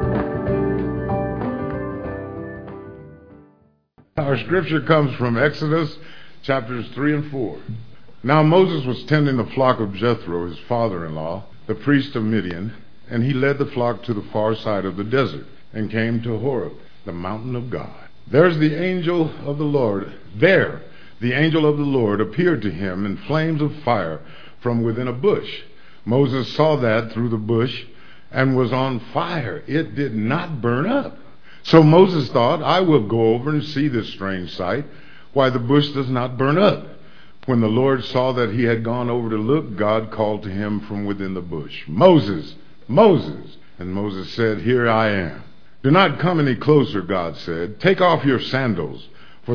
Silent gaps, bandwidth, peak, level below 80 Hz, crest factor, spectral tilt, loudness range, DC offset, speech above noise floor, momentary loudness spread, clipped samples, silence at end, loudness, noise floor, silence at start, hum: none; 5.4 kHz; 0 dBFS; -48 dBFS; 20 dB; -8.5 dB/octave; 5 LU; 2%; 38 dB; 14 LU; under 0.1%; 0 s; -20 LUFS; -57 dBFS; 0 s; none